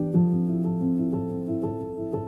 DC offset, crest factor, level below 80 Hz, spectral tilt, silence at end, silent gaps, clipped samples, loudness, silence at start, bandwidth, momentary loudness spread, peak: under 0.1%; 14 dB; -56 dBFS; -12.5 dB/octave; 0 s; none; under 0.1%; -26 LUFS; 0 s; 1.9 kHz; 8 LU; -10 dBFS